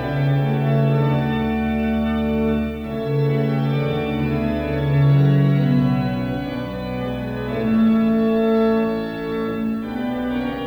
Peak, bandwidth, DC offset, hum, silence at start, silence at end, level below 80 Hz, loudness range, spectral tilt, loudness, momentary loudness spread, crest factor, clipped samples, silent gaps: -6 dBFS; 5.6 kHz; under 0.1%; none; 0 s; 0 s; -38 dBFS; 2 LU; -9.5 dB/octave; -20 LUFS; 9 LU; 12 dB; under 0.1%; none